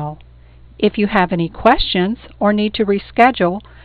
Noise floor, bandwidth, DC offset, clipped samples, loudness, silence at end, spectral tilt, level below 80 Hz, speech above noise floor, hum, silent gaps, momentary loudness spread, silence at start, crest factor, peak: -42 dBFS; 5.2 kHz; under 0.1%; under 0.1%; -16 LUFS; 0.25 s; -8 dB/octave; -34 dBFS; 27 dB; none; none; 6 LU; 0 s; 16 dB; 0 dBFS